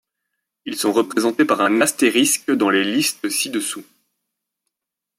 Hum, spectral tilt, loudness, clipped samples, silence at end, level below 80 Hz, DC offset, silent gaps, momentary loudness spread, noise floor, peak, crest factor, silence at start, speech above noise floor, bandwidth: none; -2.5 dB/octave; -18 LUFS; under 0.1%; 1.35 s; -70 dBFS; under 0.1%; none; 10 LU; -84 dBFS; -2 dBFS; 18 dB; 0.65 s; 66 dB; 16.5 kHz